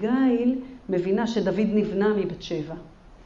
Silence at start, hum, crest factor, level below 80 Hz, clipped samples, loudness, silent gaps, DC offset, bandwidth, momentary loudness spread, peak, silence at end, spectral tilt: 0 s; none; 12 dB; -52 dBFS; under 0.1%; -25 LUFS; none; under 0.1%; 7.4 kHz; 10 LU; -12 dBFS; 0.05 s; -7 dB/octave